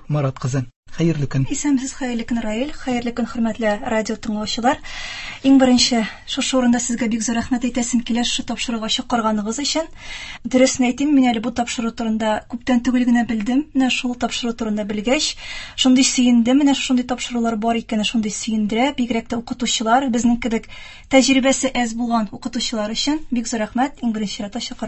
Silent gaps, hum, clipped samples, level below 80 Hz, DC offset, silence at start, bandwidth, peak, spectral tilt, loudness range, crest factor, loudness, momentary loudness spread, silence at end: 0.76-0.83 s; none; under 0.1%; -44 dBFS; under 0.1%; 0.1 s; 8.6 kHz; 0 dBFS; -4 dB/octave; 4 LU; 18 dB; -19 LUFS; 9 LU; 0 s